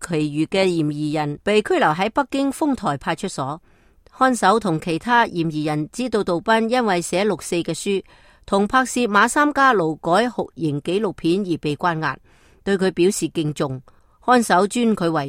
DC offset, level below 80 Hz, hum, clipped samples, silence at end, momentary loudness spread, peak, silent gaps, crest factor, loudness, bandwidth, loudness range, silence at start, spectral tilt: under 0.1%; -52 dBFS; none; under 0.1%; 0 s; 9 LU; -2 dBFS; none; 18 dB; -20 LUFS; 16.5 kHz; 3 LU; 0 s; -5 dB/octave